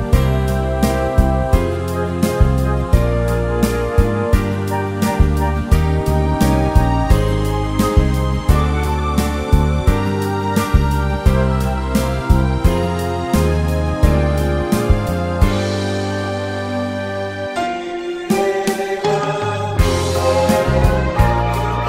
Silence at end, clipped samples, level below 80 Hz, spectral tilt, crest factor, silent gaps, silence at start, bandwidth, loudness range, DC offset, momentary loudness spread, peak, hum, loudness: 0 s; under 0.1%; -20 dBFS; -6.5 dB/octave; 16 dB; none; 0 s; 16.5 kHz; 3 LU; under 0.1%; 5 LU; 0 dBFS; none; -17 LUFS